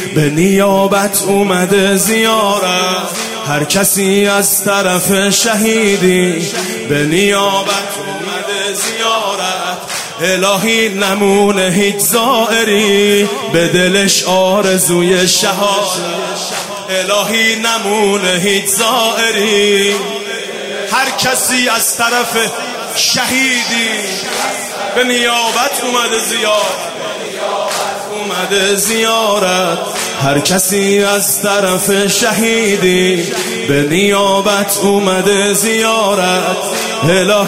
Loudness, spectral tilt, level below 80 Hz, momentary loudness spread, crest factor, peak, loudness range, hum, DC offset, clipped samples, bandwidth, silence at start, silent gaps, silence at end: -12 LUFS; -3 dB/octave; -50 dBFS; 7 LU; 12 dB; 0 dBFS; 3 LU; none; under 0.1%; under 0.1%; 16.5 kHz; 0 s; none; 0 s